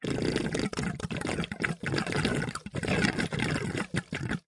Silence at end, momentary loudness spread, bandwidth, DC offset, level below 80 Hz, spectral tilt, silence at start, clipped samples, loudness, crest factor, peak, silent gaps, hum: 0.1 s; 6 LU; 11.5 kHz; under 0.1%; -50 dBFS; -5 dB/octave; 0 s; under 0.1%; -31 LUFS; 24 dB; -6 dBFS; none; none